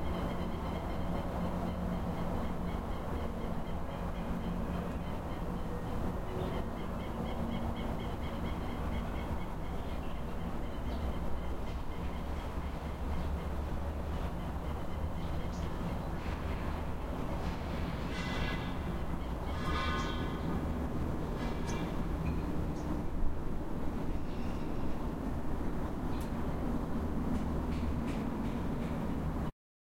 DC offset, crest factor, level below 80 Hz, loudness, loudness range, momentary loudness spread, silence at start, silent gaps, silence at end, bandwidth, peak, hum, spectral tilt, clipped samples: under 0.1%; 16 dB; -40 dBFS; -38 LUFS; 3 LU; 4 LU; 0 s; none; 0.5 s; 16.5 kHz; -18 dBFS; none; -7 dB/octave; under 0.1%